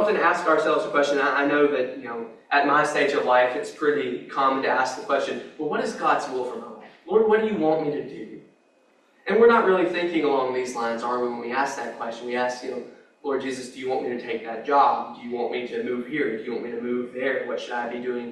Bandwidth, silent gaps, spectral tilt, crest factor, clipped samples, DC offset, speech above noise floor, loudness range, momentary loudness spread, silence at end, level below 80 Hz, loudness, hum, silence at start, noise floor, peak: 11.5 kHz; none; -4.5 dB/octave; 18 dB; under 0.1%; under 0.1%; 37 dB; 6 LU; 13 LU; 0 s; -72 dBFS; -24 LUFS; none; 0 s; -61 dBFS; -6 dBFS